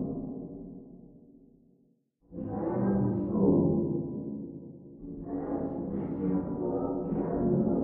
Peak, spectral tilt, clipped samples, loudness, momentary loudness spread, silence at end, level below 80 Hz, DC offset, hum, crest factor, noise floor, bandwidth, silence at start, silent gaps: -14 dBFS; -13.5 dB/octave; under 0.1%; -31 LUFS; 19 LU; 0 s; -54 dBFS; under 0.1%; none; 18 dB; -68 dBFS; 2.4 kHz; 0 s; none